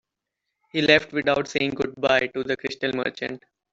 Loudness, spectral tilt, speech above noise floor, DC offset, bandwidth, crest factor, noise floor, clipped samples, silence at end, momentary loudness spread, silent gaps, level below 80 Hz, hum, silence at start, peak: -23 LUFS; -4.5 dB/octave; 59 dB; under 0.1%; 8 kHz; 22 dB; -83 dBFS; under 0.1%; 0.35 s; 12 LU; none; -58 dBFS; none; 0.75 s; -4 dBFS